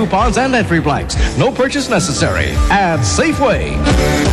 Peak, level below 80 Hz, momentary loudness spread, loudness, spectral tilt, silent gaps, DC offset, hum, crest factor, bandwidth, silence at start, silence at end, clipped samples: -2 dBFS; -20 dBFS; 3 LU; -14 LUFS; -5 dB/octave; none; 0.3%; none; 12 dB; 13.5 kHz; 0 s; 0 s; under 0.1%